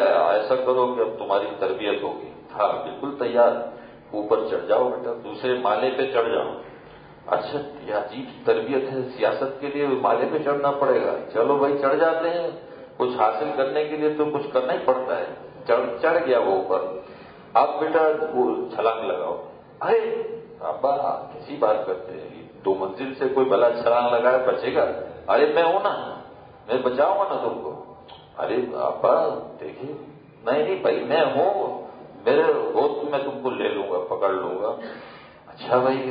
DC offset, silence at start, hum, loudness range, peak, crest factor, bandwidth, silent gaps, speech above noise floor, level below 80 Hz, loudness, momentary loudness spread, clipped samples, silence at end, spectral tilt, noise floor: under 0.1%; 0 s; none; 4 LU; -4 dBFS; 18 dB; 5.2 kHz; none; 22 dB; -64 dBFS; -23 LUFS; 15 LU; under 0.1%; 0 s; -9.5 dB/octave; -45 dBFS